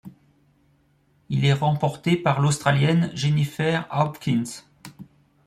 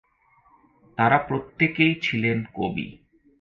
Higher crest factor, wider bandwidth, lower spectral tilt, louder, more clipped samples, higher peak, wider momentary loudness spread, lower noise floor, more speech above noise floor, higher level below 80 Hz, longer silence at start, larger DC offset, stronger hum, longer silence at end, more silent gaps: about the same, 20 dB vs 22 dB; first, 14 kHz vs 7.2 kHz; about the same, -6 dB/octave vs -7 dB/octave; about the same, -22 LUFS vs -23 LUFS; neither; about the same, -4 dBFS vs -4 dBFS; second, 10 LU vs 13 LU; about the same, -63 dBFS vs -61 dBFS; first, 41 dB vs 37 dB; about the same, -58 dBFS vs -56 dBFS; second, 0.05 s vs 1 s; neither; neither; about the same, 0.45 s vs 0.45 s; neither